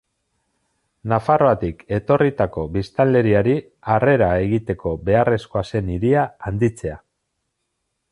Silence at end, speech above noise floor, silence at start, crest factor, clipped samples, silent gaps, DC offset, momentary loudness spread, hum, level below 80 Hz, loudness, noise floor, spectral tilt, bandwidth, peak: 1.15 s; 56 dB; 1.05 s; 16 dB; under 0.1%; none; under 0.1%; 8 LU; none; -40 dBFS; -19 LUFS; -75 dBFS; -8.5 dB/octave; 11.5 kHz; -2 dBFS